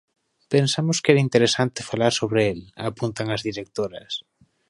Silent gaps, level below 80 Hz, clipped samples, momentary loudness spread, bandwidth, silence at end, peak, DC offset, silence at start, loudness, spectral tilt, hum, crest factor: none; -56 dBFS; under 0.1%; 12 LU; 11.5 kHz; 0.5 s; -2 dBFS; under 0.1%; 0.5 s; -23 LUFS; -5 dB/octave; none; 22 dB